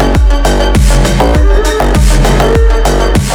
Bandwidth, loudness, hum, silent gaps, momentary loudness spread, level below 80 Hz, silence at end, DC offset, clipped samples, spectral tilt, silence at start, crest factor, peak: 16.5 kHz; -9 LUFS; none; none; 2 LU; -8 dBFS; 0 s; under 0.1%; 0.3%; -5.5 dB/octave; 0 s; 6 dB; 0 dBFS